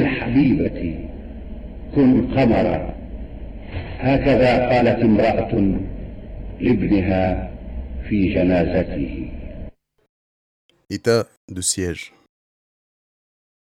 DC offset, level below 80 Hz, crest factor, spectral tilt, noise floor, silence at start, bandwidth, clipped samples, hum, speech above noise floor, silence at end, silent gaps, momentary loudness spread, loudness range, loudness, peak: under 0.1%; -34 dBFS; 16 dB; -6 dB/octave; under -90 dBFS; 0 s; 13.5 kHz; under 0.1%; none; over 72 dB; 1.65 s; 10.09-10.69 s, 11.37-11.48 s; 20 LU; 7 LU; -19 LUFS; -4 dBFS